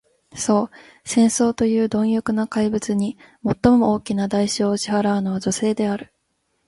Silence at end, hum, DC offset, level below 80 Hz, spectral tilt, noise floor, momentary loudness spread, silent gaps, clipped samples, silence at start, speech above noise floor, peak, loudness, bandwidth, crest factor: 0.65 s; none; under 0.1%; -50 dBFS; -5 dB/octave; -70 dBFS; 10 LU; none; under 0.1%; 0.35 s; 51 dB; -4 dBFS; -20 LUFS; 11.5 kHz; 18 dB